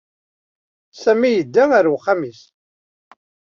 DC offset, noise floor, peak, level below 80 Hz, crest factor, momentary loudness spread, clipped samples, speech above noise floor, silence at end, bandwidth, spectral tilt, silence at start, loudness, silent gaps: under 0.1%; under -90 dBFS; -2 dBFS; -66 dBFS; 18 dB; 8 LU; under 0.1%; over 74 dB; 1.2 s; 7.2 kHz; -6 dB/octave; 0.95 s; -16 LUFS; none